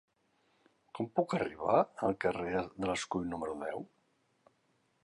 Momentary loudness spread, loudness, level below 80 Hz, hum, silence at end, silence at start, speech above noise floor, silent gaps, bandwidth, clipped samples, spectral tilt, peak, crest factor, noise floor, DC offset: 12 LU; -34 LUFS; -64 dBFS; none; 1.2 s; 0.95 s; 41 dB; none; 11 kHz; under 0.1%; -5.5 dB/octave; -14 dBFS; 22 dB; -75 dBFS; under 0.1%